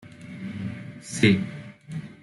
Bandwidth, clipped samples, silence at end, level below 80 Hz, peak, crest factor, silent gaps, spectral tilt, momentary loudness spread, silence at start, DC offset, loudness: 12 kHz; under 0.1%; 0 s; -62 dBFS; -6 dBFS; 22 dB; none; -5.5 dB/octave; 19 LU; 0 s; under 0.1%; -25 LUFS